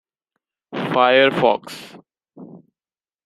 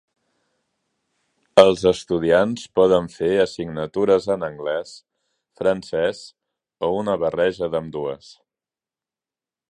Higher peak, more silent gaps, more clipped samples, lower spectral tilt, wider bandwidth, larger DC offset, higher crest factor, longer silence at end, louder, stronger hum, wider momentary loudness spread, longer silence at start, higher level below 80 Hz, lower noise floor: about the same, -2 dBFS vs 0 dBFS; neither; neither; about the same, -5 dB/octave vs -5.5 dB/octave; first, 13 kHz vs 11 kHz; neither; about the same, 20 dB vs 22 dB; second, 0.7 s vs 1.55 s; first, -17 LUFS vs -20 LUFS; neither; first, 21 LU vs 13 LU; second, 0.7 s vs 1.55 s; second, -66 dBFS vs -54 dBFS; about the same, under -90 dBFS vs under -90 dBFS